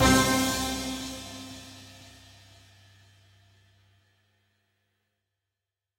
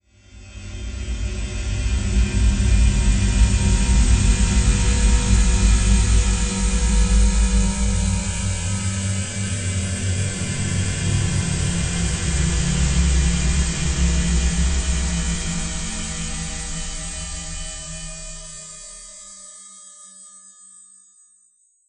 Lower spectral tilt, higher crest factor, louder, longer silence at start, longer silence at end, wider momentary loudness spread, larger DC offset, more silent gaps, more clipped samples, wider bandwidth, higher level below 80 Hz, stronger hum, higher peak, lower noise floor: about the same, -3.5 dB/octave vs -4 dB/octave; first, 22 dB vs 16 dB; second, -27 LUFS vs -21 LUFS; second, 0 s vs 0.35 s; first, 3.9 s vs 1.5 s; first, 27 LU vs 16 LU; neither; neither; neither; first, 16 kHz vs 9.6 kHz; second, -46 dBFS vs -22 dBFS; neither; second, -8 dBFS vs -4 dBFS; first, -88 dBFS vs -60 dBFS